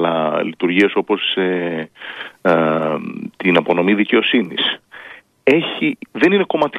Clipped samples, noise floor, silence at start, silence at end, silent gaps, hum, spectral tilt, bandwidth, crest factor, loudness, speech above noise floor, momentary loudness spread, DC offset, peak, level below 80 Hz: under 0.1%; -40 dBFS; 0 s; 0 s; none; none; -6.5 dB/octave; 9.8 kHz; 16 dB; -17 LUFS; 23 dB; 14 LU; under 0.1%; -2 dBFS; -64 dBFS